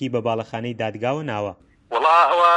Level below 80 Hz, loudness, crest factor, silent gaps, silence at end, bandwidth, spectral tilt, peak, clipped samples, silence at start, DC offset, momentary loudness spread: -62 dBFS; -21 LUFS; 16 dB; none; 0 s; 10.5 kHz; -6 dB/octave; -4 dBFS; under 0.1%; 0 s; under 0.1%; 13 LU